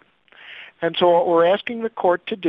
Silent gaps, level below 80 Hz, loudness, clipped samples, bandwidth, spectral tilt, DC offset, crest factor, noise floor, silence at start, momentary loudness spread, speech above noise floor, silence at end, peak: none; -66 dBFS; -19 LUFS; under 0.1%; 5.2 kHz; -7.5 dB/octave; under 0.1%; 16 dB; -47 dBFS; 0.45 s; 22 LU; 29 dB; 0 s; -4 dBFS